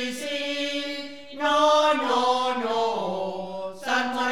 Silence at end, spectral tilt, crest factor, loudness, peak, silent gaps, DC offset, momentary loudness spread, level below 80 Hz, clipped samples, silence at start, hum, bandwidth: 0 s; -3 dB/octave; 16 dB; -24 LUFS; -8 dBFS; none; 0.5%; 14 LU; -68 dBFS; under 0.1%; 0 s; none; 17.5 kHz